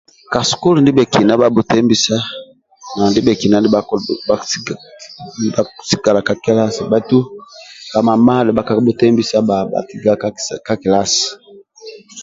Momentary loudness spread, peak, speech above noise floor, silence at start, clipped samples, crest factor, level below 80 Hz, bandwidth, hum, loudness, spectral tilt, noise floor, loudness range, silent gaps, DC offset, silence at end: 16 LU; 0 dBFS; 23 dB; 0.3 s; under 0.1%; 14 dB; -48 dBFS; 7.8 kHz; none; -14 LUFS; -5 dB/octave; -36 dBFS; 4 LU; none; under 0.1%; 0 s